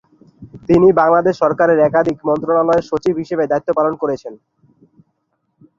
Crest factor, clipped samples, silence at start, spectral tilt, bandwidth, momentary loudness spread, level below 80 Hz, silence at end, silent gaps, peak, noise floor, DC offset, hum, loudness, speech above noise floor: 14 dB; under 0.1%; 0.4 s; -8 dB/octave; 7.4 kHz; 10 LU; -48 dBFS; 1.45 s; none; -2 dBFS; -68 dBFS; under 0.1%; none; -15 LUFS; 54 dB